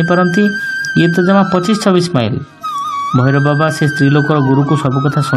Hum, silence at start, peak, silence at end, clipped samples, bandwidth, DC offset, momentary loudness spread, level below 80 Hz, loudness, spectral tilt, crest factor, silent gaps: none; 0 s; 0 dBFS; 0 s; under 0.1%; 13 kHz; under 0.1%; 8 LU; -50 dBFS; -13 LUFS; -6.5 dB/octave; 12 dB; none